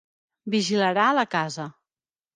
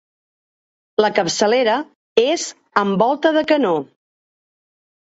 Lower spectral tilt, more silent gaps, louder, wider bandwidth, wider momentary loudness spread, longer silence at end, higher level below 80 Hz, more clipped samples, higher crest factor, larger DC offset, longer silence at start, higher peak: about the same, -4.5 dB/octave vs -4 dB/octave; second, none vs 1.95-2.16 s; second, -23 LUFS vs -18 LUFS; first, 9.8 kHz vs 8.2 kHz; first, 17 LU vs 7 LU; second, 0.65 s vs 1.2 s; second, -76 dBFS vs -64 dBFS; neither; about the same, 18 dB vs 20 dB; neither; second, 0.45 s vs 1 s; second, -8 dBFS vs 0 dBFS